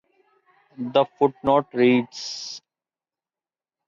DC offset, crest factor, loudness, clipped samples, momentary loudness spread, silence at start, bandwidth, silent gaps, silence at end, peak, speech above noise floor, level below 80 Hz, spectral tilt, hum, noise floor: under 0.1%; 18 dB; -22 LUFS; under 0.1%; 15 LU; 0.8 s; 7.4 kHz; none; 1.3 s; -6 dBFS; over 69 dB; -62 dBFS; -5 dB/octave; none; under -90 dBFS